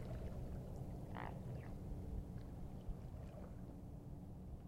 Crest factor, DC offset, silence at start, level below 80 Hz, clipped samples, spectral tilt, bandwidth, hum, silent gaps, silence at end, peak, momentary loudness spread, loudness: 14 dB; under 0.1%; 0 s; -54 dBFS; under 0.1%; -8 dB/octave; 16 kHz; none; none; 0 s; -34 dBFS; 5 LU; -51 LUFS